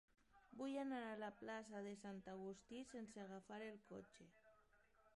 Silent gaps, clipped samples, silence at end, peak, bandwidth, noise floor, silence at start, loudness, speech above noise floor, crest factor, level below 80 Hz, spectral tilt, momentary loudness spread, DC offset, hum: none; under 0.1%; 0.1 s; -36 dBFS; 11.5 kHz; -77 dBFS; 0.35 s; -53 LUFS; 24 dB; 18 dB; -84 dBFS; -5.5 dB/octave; 12 LU; under 0.1%; none